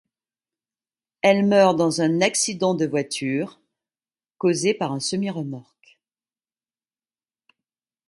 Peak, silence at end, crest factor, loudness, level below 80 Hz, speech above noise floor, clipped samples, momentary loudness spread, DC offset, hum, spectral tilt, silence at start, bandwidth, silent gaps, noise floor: -2 dBFS; 2.45 s; 22 dB; -21 LUFS; -70 dBFS; over 69 dB; under 0.1%; 11 LU; under 0.1%; none; -4.5 dB/octave; 1.25 s; 11.5 kHz; none; under -90 dBFS